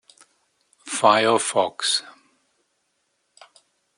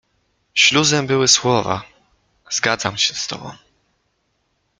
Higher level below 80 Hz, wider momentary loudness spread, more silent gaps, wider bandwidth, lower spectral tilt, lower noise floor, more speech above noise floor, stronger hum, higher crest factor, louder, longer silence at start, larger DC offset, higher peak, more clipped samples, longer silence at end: second, -76 dBFS vs -56 dBFS; second, 7 LU vs 14 LU; neither; about the same, 11 kHz vs 11 kHz; about the same, -2 dB/octave vs -2 dB/octave; first, -72 dBFS vs -68 dBFS; about the same, 52 dB vs 50 dB; neither; about the same, 24 dB vs 20 dB; second, -20 LUFS vs -16 LUFS; first, 0.85 s vs 0.55 s; neither; about the same, -2 dBFS vs 0 dBFS; neither; first, 1.85 s vs 1.25 s